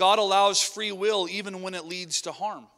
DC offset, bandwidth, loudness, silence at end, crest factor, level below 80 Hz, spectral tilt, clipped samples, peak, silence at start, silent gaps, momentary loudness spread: under 0.1%; 16 kHz; -25 LUFS; 0.15 s; 16 dB; -78 dBFS; -1.5 dB/octave; under 0.1%; -8 dBFS; 0 s; none; 13 LU